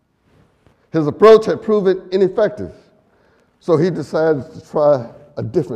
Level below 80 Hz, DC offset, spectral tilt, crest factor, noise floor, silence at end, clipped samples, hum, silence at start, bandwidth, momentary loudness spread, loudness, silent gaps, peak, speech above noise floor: -54 dBFS; under 0.1%; -7.5 dB/octave; 16 dB; -56 dBFS; 0 s; under 0.1%; none; 0.95 s; 9 kHz; 19 LU; -16 LUFS; none; 0 dBFS; 41 dB